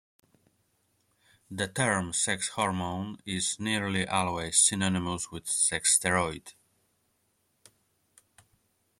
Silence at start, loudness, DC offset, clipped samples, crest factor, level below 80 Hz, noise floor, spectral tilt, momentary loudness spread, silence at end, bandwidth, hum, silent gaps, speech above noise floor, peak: 1.5 s; -27 LUFS; under 0.1%; under 0.1%; 24 dB; -62 dBFS; -74 dBFS; -2.5 dB/octave; 12 LU; 2.5 s; 15.5 kHz; none; none; 45 dB; -8 dBFS